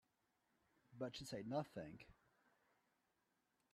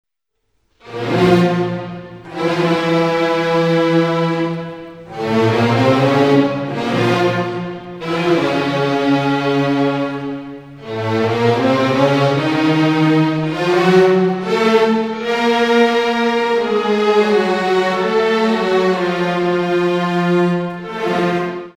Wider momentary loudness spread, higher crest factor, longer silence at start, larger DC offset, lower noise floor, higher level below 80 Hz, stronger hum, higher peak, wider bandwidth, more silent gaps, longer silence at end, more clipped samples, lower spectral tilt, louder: first, 19 LU vs 11 LU; first, 22 dB vs 14 dB; about the same, 0.9 s vs 0.85 s; neither; first, -86 dBFS vs -71 dBFS; second, -80 dBFS vs -54 dBFS; neither; second, -32 dBFS vs 0 dBFS; about the same, 13.5 kHz vs 14.5 kHz; neither; first, 1.6 s vs 0.05 s; neither; about the same, -5.5 dB/octave vs -6.5 dB/octave; second, -50 LUFS vs -15 LUFS